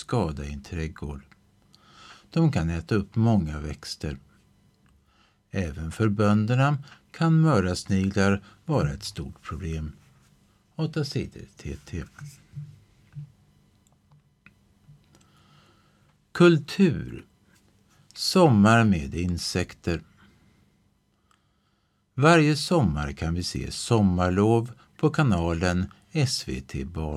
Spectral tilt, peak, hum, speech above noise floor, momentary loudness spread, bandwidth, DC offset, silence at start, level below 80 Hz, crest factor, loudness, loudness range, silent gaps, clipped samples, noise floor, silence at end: -6 dB/octave; -4 dBFS; none; 45 dB; 20 LU; 13.5 kHz; under 0.1%; 0 s; -44 dBFS; 22 dB; -25 LUFS; 12 LU; none; under 0.1%; -69 dBFS; 0 s